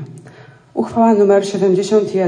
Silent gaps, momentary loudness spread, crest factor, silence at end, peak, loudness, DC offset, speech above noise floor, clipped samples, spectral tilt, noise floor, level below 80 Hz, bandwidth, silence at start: none; 13 LU; 14 dB; 0 s; -2 dBFS; -14 LUFS; under 0.1%; 28 dB; under 0.1%; -6.5 dB/octave; -41 dBFS; -60 dBFS; 10 kHz; 0 s